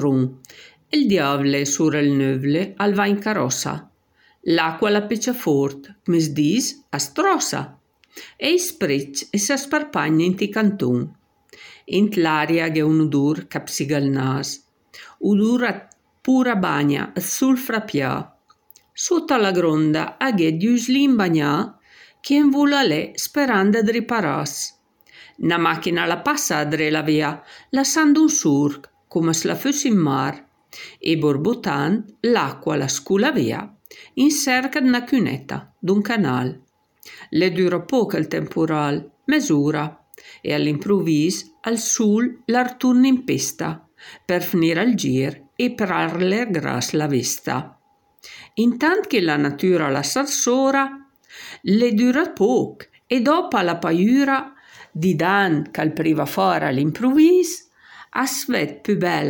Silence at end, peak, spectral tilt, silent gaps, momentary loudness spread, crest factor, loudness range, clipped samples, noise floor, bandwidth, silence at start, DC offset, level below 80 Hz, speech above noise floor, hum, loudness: 0 s; -4 dBFS; -4.5 dB/octave; none; 10 LU; 16 dB; 3 LU; under 0.1%; -59 dBFS; 17.5 kHz; 0 s; under 0.1%; -64 dBFS; 40 dB; none; -20 LUFS